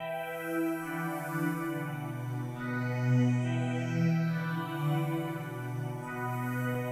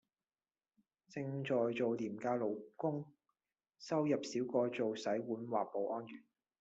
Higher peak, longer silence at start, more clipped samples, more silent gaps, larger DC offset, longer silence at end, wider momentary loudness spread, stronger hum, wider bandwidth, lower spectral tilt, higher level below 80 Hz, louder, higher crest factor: first, -18 dBFS vs -22 dBFS; second, 0 s vs 1.1 s; neither; neither; neither; second, 0 s vs 0.4 s; second, 8 LU vs 11 LU; neither; first, 16 kHz vs 8 kHz; first, -7.5 dB/octave vs -6 dB/octave; first, -68 dBFS vs -84 dBFS; first, -33 LUFS vs -39 LUFS; about the same, 14 dB vs 18 dB